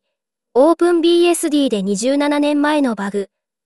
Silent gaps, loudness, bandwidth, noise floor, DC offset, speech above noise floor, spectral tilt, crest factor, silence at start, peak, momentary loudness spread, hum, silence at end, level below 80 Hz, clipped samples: none; -16 LUFS; 13.5 kHz; -78 dBFS; 0.2%; 63 dB; -4.5 dB/octave; 14 dB; 0.55 s; -2 dBFS; 9 LU; none; 0.4 s; -66 dBFS; under 0.1%